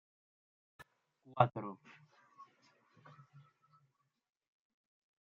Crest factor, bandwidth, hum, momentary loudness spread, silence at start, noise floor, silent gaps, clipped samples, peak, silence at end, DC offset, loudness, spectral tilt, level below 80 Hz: 34 dB; 6.8 kHz; none; 28 LU; 0.8 s; -79 dBFS; none; under 0.1%; -10 dBFS; 1.85 s; under 0.1%; -36 LUFS; -6 dB/octave; -82 dBFS